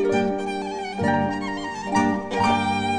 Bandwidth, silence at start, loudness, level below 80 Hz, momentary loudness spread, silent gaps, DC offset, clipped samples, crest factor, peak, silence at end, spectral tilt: 10 kHz; 0 s; -24 LUFS; -52 dBFS; 8 LU; none; 0.1%; under 0.1%; 14 dB; -8 dBFS; 0 s; -5.5 dB/octave